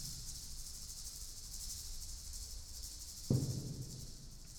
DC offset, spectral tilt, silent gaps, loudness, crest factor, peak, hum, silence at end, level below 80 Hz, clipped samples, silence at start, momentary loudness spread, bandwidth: under 0.1%; -4.5 dB/octave; none; -44 LUFS; 24 dB; -20 dBFS; none; 0 s; -52 dBFS; under 0.1%; 0 s; 10 LU; over 20 kHz